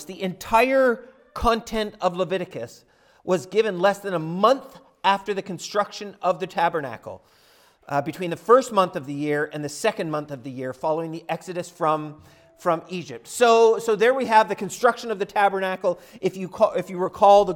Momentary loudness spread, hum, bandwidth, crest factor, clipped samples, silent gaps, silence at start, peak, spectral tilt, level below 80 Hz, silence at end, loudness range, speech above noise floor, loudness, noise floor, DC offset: 14 LU; none; 18 kHz; 18 dB; under 0.1%; none; 0 s; -4 dBFS; -4.5 dB/octave; -50 dBFS; 0 s; 7 LU; 34 dB; -23 LUFS; -57 dBFS; under 0.1%